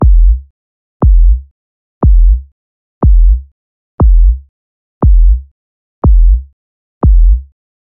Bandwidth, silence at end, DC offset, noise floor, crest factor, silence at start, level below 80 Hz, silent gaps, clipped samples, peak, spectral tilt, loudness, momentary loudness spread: 1.4 kHz; 0.55 s; under 0.1%; under -90 dBFS; 8 dB; 0 s; -8 dBFS; 0.50-1.00 s, 1.51-2.01 s, 2.52-3.01 s, 3.52-3.98 s, 4.49-5.01 s, 5.51-6.02 s, 6.53-7.01 s; under 0.1%; 0 dBFS; -16 dB/octave; -12 LUFS; 8 LU